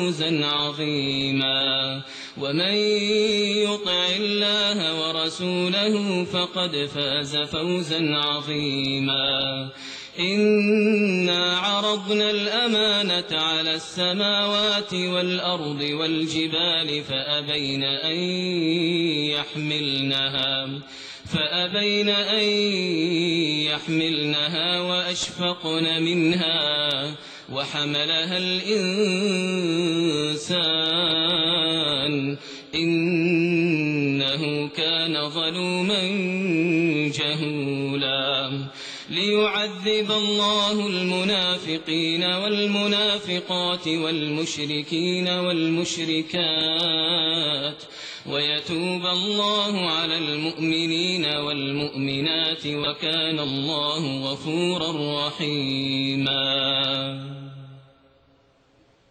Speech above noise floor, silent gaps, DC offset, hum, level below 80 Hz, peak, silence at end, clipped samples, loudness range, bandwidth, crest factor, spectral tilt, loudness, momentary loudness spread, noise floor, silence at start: 36 dB; none; under 0.1%; none; -62 dBFS; -10 dBFS; 1.3 s; under 0.1%; 3 LU; 9.2 kHz; 14 dB; -4.5 dB/octave; -22 LUFS; 6 LU; -59 dBFS; 0 s